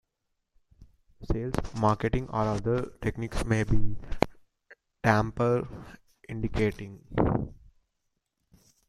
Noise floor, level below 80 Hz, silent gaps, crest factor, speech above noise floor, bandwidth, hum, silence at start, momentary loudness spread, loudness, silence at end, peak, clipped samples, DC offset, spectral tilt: -80 dBFS; -40 dBFS; none; 26 dB; 54 dB; 12.5 kHz; none; 0.8 s; 12 LU; -29 LUFS; 1.35 s; -2 dBFS; under 0.1%; under 0.1%; -7 dB/octave